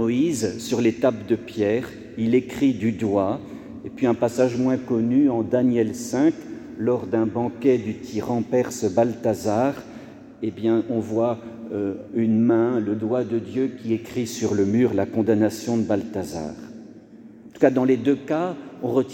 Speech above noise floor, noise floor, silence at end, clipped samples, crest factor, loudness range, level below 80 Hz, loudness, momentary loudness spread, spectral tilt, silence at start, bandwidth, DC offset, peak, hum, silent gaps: 23 dB; -44 dBFS; 0 s; under 0.1%; 18 dB; 2 LU; -60 dBFS; -23 LUFS; 12 LU; -6.5 dB/octave; 0 s; 17 kHz; under 0.1%; -4 dBFS; none; none